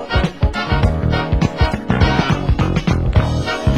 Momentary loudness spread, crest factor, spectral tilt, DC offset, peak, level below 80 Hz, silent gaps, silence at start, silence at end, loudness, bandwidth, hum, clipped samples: 4 LU; 16 dB; -7 dB/octave; 0.7%; 0 dBFS; -20 dBFS; none; 0 s; 0 s; -17 LUFS; 11.5 kHz; none; under 0.1%